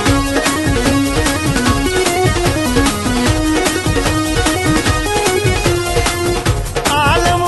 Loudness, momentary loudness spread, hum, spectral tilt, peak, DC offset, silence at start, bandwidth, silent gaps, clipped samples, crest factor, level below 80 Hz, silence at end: -14 LUFS; 2 LU; none; -4 dB/octave; 0 dBFS; under 0.1%; 0 s; 12.5 kHz; none; under 0.1%; 14 dB; -24 dBFS; 0 s